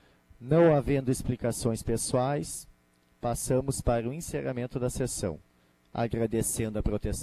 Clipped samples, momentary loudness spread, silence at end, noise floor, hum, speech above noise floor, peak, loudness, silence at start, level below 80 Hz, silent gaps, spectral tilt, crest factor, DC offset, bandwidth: under 0.1%; 12 LU; 0 s; -65 dBFS; none; 37 dB; -12 dBFS; -29 LUFS; 0.4 s; -44 dBFS; none; -6 dB/octave; 18 dB; under 0.1%; 14.5 kHz